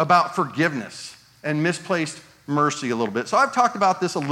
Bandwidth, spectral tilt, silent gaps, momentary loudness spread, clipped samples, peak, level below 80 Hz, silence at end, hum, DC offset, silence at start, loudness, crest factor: 16 kHz; -5 dB/octave; none; 14 LU; under 0.1%; -4 dBFS; -70 dBFS; 0 s; none; under 0.1%; 0 s; -22 LUFS; 18 dB